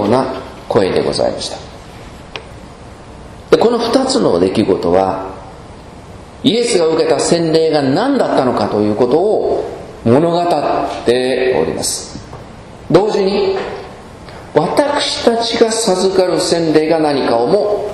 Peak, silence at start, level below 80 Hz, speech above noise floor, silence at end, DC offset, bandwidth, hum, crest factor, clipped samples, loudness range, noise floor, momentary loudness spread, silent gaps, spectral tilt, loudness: 0 dBFS; 0 s; -42 dBFS; 21 dB; 0 s; under 0.1%; 13 kHz; none; 14 dB; 0.1%; 4 LU; -34 dBFS; 21 LU; none; -4.5 dB/octave; -14 LUFS